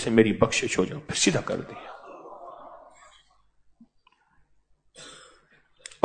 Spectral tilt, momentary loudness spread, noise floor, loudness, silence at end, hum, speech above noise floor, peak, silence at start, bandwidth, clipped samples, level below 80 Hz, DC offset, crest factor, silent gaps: -4 dB/octave; 24 LU; -65 dBFS; -24 LUFS; 0.85 s; none; 40 dB; -4 dBFS; 0 s; 9.4 kHz; under 0.1%; -56 dBFS; under 0.1%; 26 dB; none